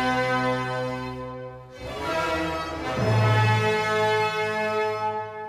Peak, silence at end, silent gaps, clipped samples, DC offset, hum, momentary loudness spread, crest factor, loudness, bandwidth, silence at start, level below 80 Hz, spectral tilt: -10 dBFS; 0 s; none; under 0.1%; under 0.1%; none; 14 LU; 14 dB; -24 LUFS; 14.5 kHz; 0 s; -50 dBFS; -6 dB/octave